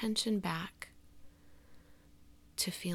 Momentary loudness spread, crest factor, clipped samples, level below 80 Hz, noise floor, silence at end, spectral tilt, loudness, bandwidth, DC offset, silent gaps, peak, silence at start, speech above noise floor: 17 LU; 22 dB; under 0.1%; -66 dBFS; -60 dBFS; 0 s; -3.5 dB/octave; -36 LUFS; 17 kHz; under 0.1%; none; -18 dBFS; 0 s; 24 dB